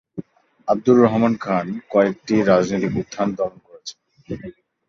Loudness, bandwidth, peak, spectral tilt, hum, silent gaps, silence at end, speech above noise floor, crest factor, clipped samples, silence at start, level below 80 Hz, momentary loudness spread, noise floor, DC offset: -19 LUFS; 7.4 kHz; -2 dBFS; -7 dB/octave; none; none; 0.4 s; 22 dB; 18 dB; under 0.1%; 0.15 s; -54 dBFS; 21 LU; -40 dBFS; under 0.1%